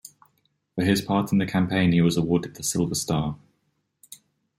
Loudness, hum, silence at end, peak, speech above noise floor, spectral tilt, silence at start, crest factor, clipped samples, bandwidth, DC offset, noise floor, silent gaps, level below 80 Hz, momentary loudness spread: -23 LUFS; none; 0.45 s; -8 dBFS; 50 dB; -5.5 dB/octave; 0.05 s; 16 dB; under 0.1%; 16 kHz; under 0.1%; -73 dBFS; none; -54 dBFS; 7 LU